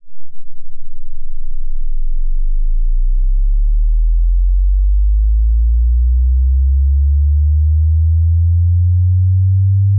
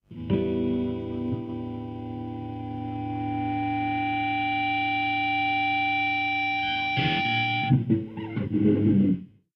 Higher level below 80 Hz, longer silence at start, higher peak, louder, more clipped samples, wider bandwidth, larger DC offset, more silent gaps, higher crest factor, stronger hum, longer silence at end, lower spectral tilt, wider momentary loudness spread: first, -12 dBFS vs -52 dBFS; about the same, 0.05 s vs 0.1 s; about the same, -8 dBFS vs -8 dBFS; first, -15 LUFS vs -26 LUFS; neither; second, 0.2 kHz vs 6.2 kHz; neither; neither; second, 4 dB vs 18 dB; neither; second, 0 s vs 0.3 s; first, -16.5 dB/octave vs -8.5 dB/octave; about the same, 13 LU vs 11 LU